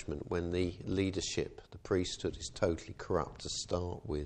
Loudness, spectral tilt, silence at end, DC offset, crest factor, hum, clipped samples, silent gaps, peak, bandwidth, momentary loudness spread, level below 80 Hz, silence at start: -36 LUFS; -5 dB/octave; 0 s; under 0.1%; 20 dB; none; under 0.1%; none; -18 dBFS; 9.6 kHz; 5 LU; -52 dBFS; 0 s